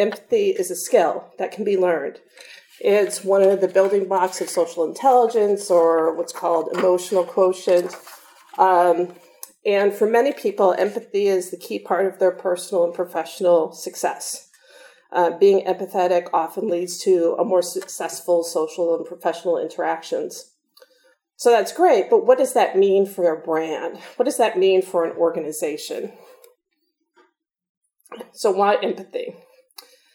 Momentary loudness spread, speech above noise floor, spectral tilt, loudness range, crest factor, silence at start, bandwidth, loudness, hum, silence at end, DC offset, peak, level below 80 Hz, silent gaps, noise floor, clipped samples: 12 LU; 53 dB; -4 dB/octave; 6 LU; 18 dB; 0 s; 18.5 kHz; -20 LUFS; none; 0.8 s; under 0.1%; -2 dBFS; -86 dBFS; 27.69-27.81 s; -73 dBFS; under 0.1%